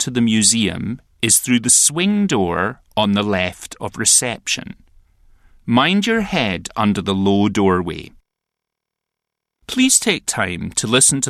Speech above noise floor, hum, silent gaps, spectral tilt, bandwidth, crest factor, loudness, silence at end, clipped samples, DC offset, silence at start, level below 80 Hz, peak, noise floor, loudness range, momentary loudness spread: 65 dB; none; none; -3 dB/octave; 14.5 kHz; 16 dB; -16 LUFS; 0 s; under 0.1%; under 0.1%; 0 s; -48 dBFS; -2 dBFS; -82 dBFS; 5 LU; 11 LU